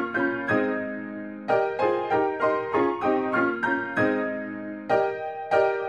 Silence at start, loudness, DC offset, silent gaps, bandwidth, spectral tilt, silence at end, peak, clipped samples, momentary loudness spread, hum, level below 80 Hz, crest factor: 0 s; -25 LUFS; under 0.1%; none; 9.6 kHz; -7 dB/octave; 0 s; -10 dBFS; under 0.1%; 9 LU; none; -64 dBFS; 16 dB